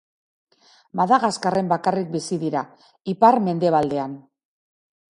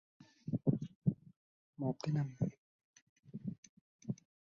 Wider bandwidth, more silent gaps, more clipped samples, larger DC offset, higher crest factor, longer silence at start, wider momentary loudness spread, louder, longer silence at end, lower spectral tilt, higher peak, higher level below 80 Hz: first, 11 kHz vs 7.2 kHz; second, none vs 0.95-1.02 s, 1.36-1.73 s, 2.58-2.94 s, 3.02-3.16 s, 3.58-3.63 s, 3.69-3.99 s; neither; neither; about the same, 20 dB vs 22 dB; first, 0.95 s vs 0.2 s; about the same, 16 LU vs 15 LU; first, -21 LUFS vs -40 LUFS; first, 0.95 s vs 0.35 s; second, -6 dB/octave vs -9.5 dB/octave; first, -2 dBFS vs -18 dBFS; first, -64 dBFS vs -70 dBFS